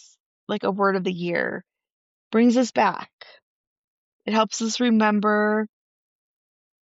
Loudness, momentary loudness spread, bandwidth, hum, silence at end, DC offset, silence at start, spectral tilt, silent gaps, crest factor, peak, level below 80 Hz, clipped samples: -22 LUFS; 15 LU; 8 kHz; none; 1.3 s; under 0.1%; 0.5 s; -4 dB/octave; 1.93-2.31 s, 3.13-3.18 s, 3.42-4.19 s; 16 dB; -8 dBFS; -74 dBFS; under 0.1%